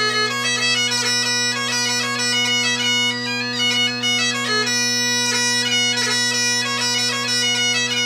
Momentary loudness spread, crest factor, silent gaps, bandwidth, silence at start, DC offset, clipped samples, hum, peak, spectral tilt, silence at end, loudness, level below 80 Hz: 2 LU; 14 dB; none; 15.5 kHz; 0 s; under 0.1%; under 0.1%; none; -6 dBFS; -1 dB/octave; 0 s; -17 LUFS; -70 dBFS